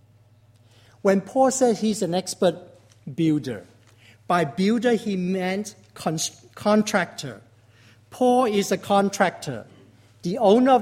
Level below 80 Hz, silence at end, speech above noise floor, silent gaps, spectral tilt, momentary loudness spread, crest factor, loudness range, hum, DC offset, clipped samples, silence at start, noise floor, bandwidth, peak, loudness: -64 dBFS; 0 s; 34 dB; none; -5 dB/octave; 15 LU; 18 dB; 2 LU; none; under 0.1%; under 0.1%; 1.05 s; -55 dBFS; 16 kHz; -4 dBFS; -22 LUFS